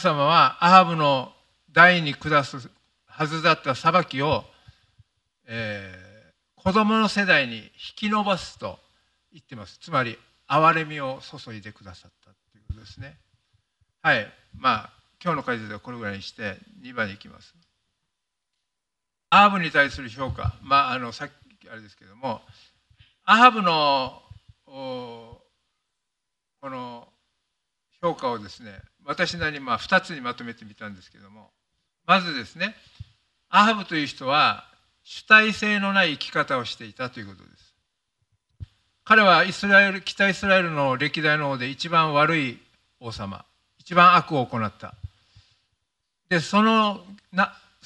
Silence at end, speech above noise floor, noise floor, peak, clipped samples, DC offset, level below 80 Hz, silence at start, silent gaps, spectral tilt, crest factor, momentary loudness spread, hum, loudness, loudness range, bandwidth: 0.35 s; 62 dB; -85 dBFS; 0 dBFS; under 0.1%; under 0.1%; -54 dBFS; 0 s; none; -5 dB/octave; 24 dB; 24 LU; none; -21 LUFS; 12 LU; 11.5 kHz